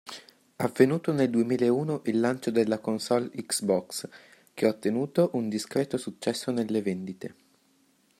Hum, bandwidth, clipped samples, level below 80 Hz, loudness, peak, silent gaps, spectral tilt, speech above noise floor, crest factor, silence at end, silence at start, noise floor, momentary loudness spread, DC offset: none; 16 kHz; under 0.1%; -72 dBFS; -27 LUFS; -6 dBFS; none; -5.5 dB/octave; 39 dB; 22 dB; 0.9 s; 0.05 s; -66 dBFS; 13 LU; under 0.1%